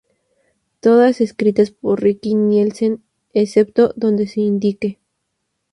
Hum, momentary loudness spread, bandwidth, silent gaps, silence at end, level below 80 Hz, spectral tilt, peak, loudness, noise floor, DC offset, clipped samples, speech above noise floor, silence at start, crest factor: none; 8 LU; 11 kHz; none; 0.8 s; -60 dBFS; -7.5 dB/octave; 0 dBFS; -16 LUFS; -73 dBFS; under 0.1%; under 0.1%; 58 dB; 0.85 s; 16 dB